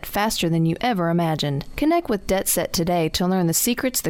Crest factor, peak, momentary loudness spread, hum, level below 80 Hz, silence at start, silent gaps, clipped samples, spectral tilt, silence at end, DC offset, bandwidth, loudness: 14 dB; -8 dBFS; 3 LU; none; -42 dBFS; 0 s; none; under 0.1%; -4.5 dB/octave; 0 s; under 0.1%; 17.5 kHz; -21 LUFS